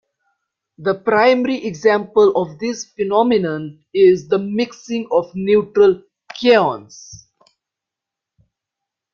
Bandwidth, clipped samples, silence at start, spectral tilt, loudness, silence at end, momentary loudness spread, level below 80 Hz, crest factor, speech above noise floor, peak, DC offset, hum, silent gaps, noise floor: 7.2 kHz; under 0.1%; 0.8 s; -5.5 dB/octave; -17 LUFS; 1.95 s; 12 LU; -60 dBFS; 16 dB; 69 dB; -2 dBFS; under 0.1%; none; none; -85 dBFS